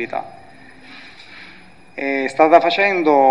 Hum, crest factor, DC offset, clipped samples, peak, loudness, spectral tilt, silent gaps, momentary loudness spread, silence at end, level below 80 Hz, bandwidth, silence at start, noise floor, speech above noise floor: none; 18 dB; 0.5%; under 0.1%; 0 dBFS; -15 LUFS; -5 dB/octave; none; 26 LU; 0 s; -62 dBFS; 10.5 kHz; 0 s; -45 dBFS; 30 dB